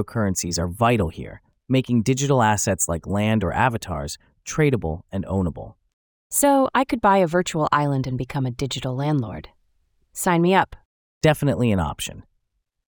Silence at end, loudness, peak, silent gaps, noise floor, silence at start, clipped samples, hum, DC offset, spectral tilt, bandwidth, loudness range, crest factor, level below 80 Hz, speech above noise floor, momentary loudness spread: 0.65 s; -22 LUFS; -4 dBFS; 5.93-6.30 s, 10.85-11.21 s; -75 dBFS; 0 s; under 0.1%; none; under 0.1%; -5 dB/octave; over 20 kHz; 3 LU; 18 dB; -46 dBFS; 54 dB; 12 LU